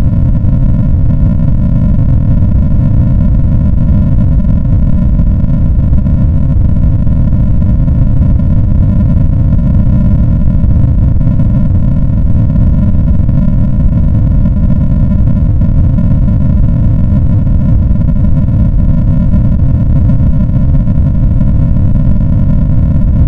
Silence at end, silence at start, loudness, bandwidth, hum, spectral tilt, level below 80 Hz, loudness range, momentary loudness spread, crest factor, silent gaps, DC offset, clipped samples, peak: 0 s; 0 s; -10 LUFS; 3.1 kHz; none; -12 dB/octave; -10 dBFS; 0 LU; 1 LU; 6 dB; none; under 0.1%; 0.1%; 0 dBFS